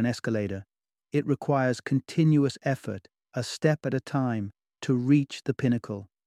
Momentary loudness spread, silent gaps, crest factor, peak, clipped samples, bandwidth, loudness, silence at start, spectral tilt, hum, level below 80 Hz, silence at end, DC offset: 14 LU; none; 18 dB; -8 dBFS; under 0.1%; 12.5 kHz; -27 LUFS; 0 s; -7 dB/octave; none; -66 dBFS; 0.2 s; under 0.1%